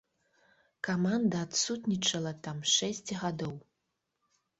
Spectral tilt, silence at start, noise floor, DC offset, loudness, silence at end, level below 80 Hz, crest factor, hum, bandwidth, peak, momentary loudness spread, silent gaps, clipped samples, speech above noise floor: -3.5 dB/octave; 0.85 s; -83 dBFS; under 0.1%; -31 LUFS; 1 s; -70 dBFS; 20 dB; none; 8.2 kHz; -14 dBFS; 11 LU; none; under 0.1%; 51 dB